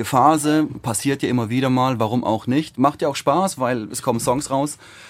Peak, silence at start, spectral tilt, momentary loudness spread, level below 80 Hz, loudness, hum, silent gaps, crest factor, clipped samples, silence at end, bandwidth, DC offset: -2 dBFS; 0 s; -5.5 dB/octave; 6 LU; -54 dBFS; -20 LUFS; none; none; 18 dB; under 0.1%; 0 s; 16 kHz; under 0.1%